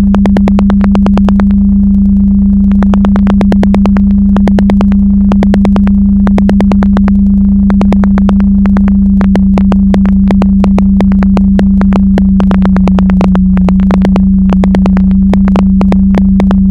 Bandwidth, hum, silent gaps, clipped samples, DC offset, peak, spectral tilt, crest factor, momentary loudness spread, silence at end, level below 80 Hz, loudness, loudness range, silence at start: 5 kHz; none; none; 0.8%; under 0.1%; 0 dBFS; -9.5 dB/octave; 6 dB; 0 LU; 0 s; -14 dBFS; -7 LUFS; 0 LU; 0 s